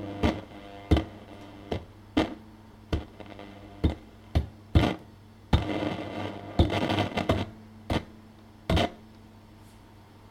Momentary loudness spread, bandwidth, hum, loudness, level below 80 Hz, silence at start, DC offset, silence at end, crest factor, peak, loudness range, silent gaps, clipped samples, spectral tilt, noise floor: 20 LU; 15.5 kHz; none; -30 LUFS; -38 dBFS; 0 s; under 0.1%; 0 s; 24 dB; -6 dBFS; 5 LU; none; under 0.1%; -7 dB/octave; -52 dBFS